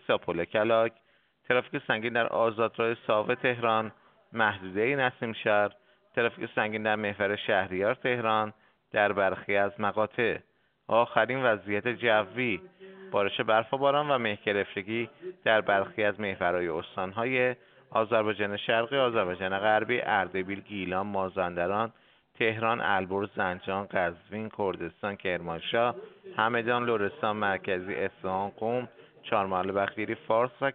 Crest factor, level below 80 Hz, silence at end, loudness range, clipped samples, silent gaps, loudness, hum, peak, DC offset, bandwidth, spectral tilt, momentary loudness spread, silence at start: 24 dB; -70 dBFS; 0 s; 3 LU; under 0.1%; none; -29 LUFS; none; -6 dBFS; under 0.1%; 4.6 kHz; -3 dB/octave; 8 LU; 0.1 s